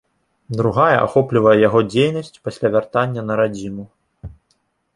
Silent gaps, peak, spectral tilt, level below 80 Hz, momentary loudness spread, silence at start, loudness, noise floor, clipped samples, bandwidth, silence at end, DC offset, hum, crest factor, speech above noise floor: none; -2 dBFS; -7 dB/octave; -50 dBFS; 15 LU; 0.5 s; -17 LUFS; -66 dBFS; under 0.1%; 11.5 kHz; 0.7 s; under 0.1%; none; 16 dB; 49 dB